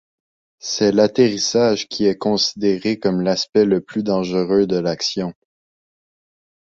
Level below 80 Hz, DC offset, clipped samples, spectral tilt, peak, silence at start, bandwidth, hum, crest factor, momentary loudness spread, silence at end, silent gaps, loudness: -56 dBFS; under 0.1%; under 0.1%; -4.5 dB/octave; -2 dBFS; 0.65 s; 7.8 kHz; none; 18 dB; 6 LU; 1.35 s; 3.49-3.53 s; -18 LUFS